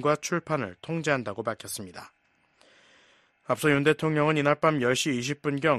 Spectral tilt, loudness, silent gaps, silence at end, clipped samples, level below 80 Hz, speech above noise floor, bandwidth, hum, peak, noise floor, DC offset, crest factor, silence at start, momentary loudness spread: -5 dB/octave; -26 LUFS; none; 0 s; under 0.1%; -66 dBFS; 37 dB; 13.5 kHz; none; -8 dBFS; -64 dBFS; under 0.1%; 20 dB; 0 s; 13 LU